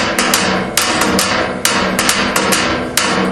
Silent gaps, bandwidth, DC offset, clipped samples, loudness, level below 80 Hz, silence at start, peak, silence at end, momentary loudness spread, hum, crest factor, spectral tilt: none; over 20 kHz; under 0.1%; under 0.1%; -13 LUFS; -38 dBFS; 0 s; 0 dBFS; 0 s; 2 LU; none; 14 dB; -2.5 dB/octave